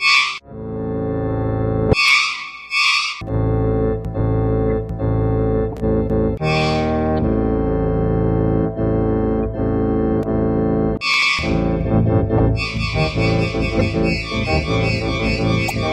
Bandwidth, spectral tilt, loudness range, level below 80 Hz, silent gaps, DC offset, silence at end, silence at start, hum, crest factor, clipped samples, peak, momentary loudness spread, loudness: 14 kHz; -6 dB/octave; 2 LU; -28 dBFS; none; under 0.1%; 0 s; 0 s; none; 16 dB; under 0.1%; -2 dBFS; 7 LU; -18 LUFS